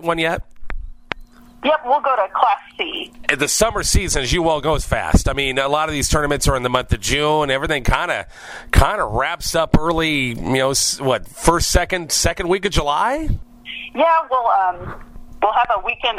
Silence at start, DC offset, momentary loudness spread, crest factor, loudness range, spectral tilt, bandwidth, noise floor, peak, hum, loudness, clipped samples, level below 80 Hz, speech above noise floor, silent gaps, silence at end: 0 s; under 0.1%; 12 LU; 18 dB; 2 LU; -3.5 dB/octave; 16 kHz; -41 dBFS; 0 dBFS; none; -18 LUFS; under 0.1%; -28 dBFS; 23 dB; none; 0 s